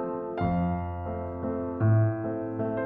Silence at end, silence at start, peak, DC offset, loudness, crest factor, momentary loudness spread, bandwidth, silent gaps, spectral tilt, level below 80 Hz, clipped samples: 0 s; 0 s; -14 dBFS; under 0.1%; -29 LUFS; 14 dB; 10 LU; 3.8 kHz; none; -12.5 dB/octave; -48 dBFS; under 0.1%